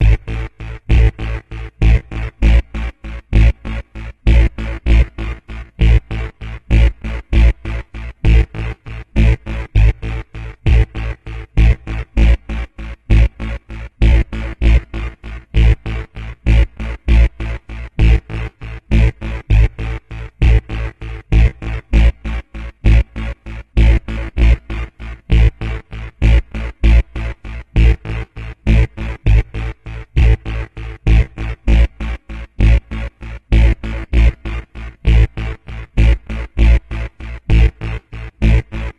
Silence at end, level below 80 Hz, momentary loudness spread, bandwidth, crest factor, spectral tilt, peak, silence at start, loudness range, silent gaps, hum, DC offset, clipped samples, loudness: 0.05 s; -16 dBFS; 14 LU; 5.6 kHz; 14 dB; -7.5 dB/octave; 0 dBFS; 0 s; 1 LU; none; none; under 0.1%; under 0.1%; -17 LUFS